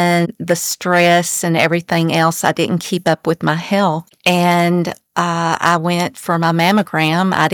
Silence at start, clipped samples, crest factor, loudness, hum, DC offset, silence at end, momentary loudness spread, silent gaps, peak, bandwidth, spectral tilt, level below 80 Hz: 0 s; under 0.1%; 14 dB; -15 LUFS; none; under 0.1%; 0 s; 5 LU; none; -2 dBFS; over 20 kHz; -4.5 dB/octave; -60 dBFS